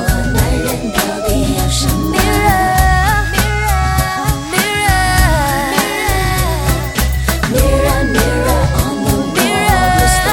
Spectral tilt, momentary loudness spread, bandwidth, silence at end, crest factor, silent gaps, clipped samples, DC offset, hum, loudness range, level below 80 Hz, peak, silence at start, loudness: -4.5 dB/octave; 4 LU; over 20 kHz; 0 s; 12 dB; none; under 0.1%; under 0.1%; none; 1 LU; -18 dBFS; 0 dBFS; 0 s; -13 LUFS